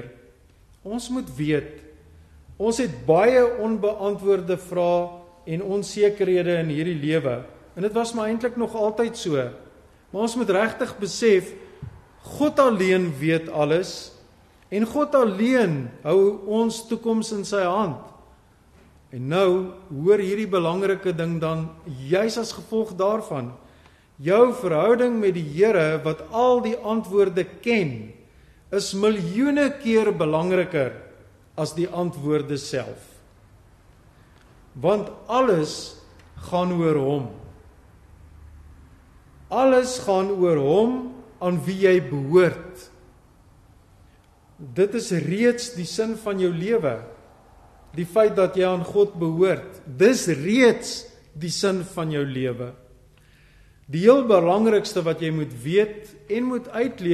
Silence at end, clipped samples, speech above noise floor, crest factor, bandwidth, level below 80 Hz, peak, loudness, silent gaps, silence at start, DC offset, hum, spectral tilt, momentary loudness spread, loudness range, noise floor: 0 s; under 0.1%; 33 dB; 20 dB; 13 kHz; -54 dBFS; -2 dBFS; -22 LUFS; none; 0 s; under 0.1%; none; -6 dB/octave; 14 LU; 6 LU; -54 dBFS